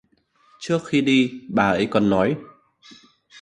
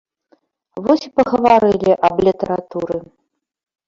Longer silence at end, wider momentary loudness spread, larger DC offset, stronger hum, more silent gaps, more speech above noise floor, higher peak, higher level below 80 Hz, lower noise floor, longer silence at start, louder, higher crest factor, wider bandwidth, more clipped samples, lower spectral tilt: second, 0 s vs 0.85 s; second, 7 LU vs 12 LU; neither; neither; neither; about the same, 41 dB vs 44 dB; about the same, -4 dBFS vs -2 dBFS; about the same, -54 dBFS vs -50 dBFS; about the same, -61 dBFS vs -59 dBFS; second, 0.6 s vs 0.75 s; second, -21 LUFS vs -16 LUFS; about the same, 18 dB vs 16 dB; first, 10.5 kHz vs 7.6 kHz; neither; about the same, -6 dB/octave vs -7 dB/octave